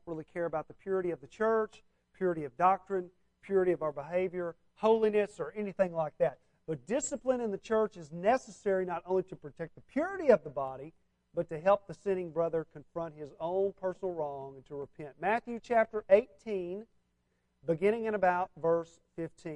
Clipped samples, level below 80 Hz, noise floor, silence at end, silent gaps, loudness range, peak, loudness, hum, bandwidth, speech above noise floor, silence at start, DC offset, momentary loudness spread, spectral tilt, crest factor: under 0.1%; -68 dBFS; -77 dBFS; 0 s; none; 3 LU; -10 dBFS; -33 LUFS; none; 10.5 kHz; 45 dB; 0.05 s; under 0.1%; 15 LU; -6 dB/octave; 22 dB